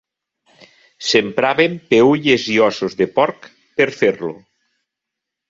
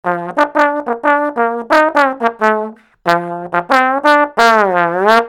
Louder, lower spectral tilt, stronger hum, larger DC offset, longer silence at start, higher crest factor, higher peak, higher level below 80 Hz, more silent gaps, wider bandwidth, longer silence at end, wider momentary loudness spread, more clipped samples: second, -16 LUFS vs -13 LUFS; about the same, -4.5 dB/octave vs -4.5 dB/octave; neither; neither; first, 1 s vs 0.05 s; about the same, 16 dB vs 14 dB; about the same, -2 dBFS vs 0 dBFS; about the same, -60 dBFS vs -56 dBFS; neither; second, 7.8 kHz vs 18 kHz; first, 1.1 s vs 0 s; about the same, 10 LU vs 8 LU; second, under 0.1% vs 0.4%